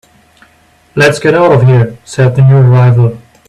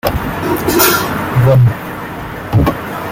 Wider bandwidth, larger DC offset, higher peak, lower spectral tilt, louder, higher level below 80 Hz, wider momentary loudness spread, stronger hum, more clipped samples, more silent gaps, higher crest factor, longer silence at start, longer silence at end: second, 11 kHz vs 17 kHz; neither; about the same, 0 dBFS vs 0 dBFS; first, -7.5 dB/octave vs -5.5 dB/octave; first, -8 LUFS vs -13 LUFS; second, -42 dBFS vs -30 dBFS; second, 7 LU vs 14 LU; neither; neither; neither; second, 8 dB vs 14 dB; first, 0.95 s vs 0.05 s; first, 0.3 s vs 0 s